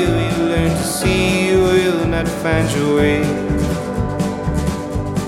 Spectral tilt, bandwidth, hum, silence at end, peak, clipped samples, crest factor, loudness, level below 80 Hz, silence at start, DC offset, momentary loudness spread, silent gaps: -5.5 dB/octave; 16 kHz; none; 0 s; -2 dBFS; under 0.1%; 14 dB; -17 LUFS; -30 dBFS; 0 s; under 0.1%; 6 LU; none